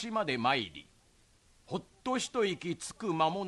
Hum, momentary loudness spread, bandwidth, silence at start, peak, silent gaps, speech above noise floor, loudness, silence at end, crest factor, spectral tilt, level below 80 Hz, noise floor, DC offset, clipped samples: none; 11 LU; 12 kHz; 0 s; -14 dBFS; none; 32 dB; -33 LUFS; 0 s; 20 dB; -4 dB/octave; -68 dBFS; -65 dBFS; under 0.1%; under 0.1%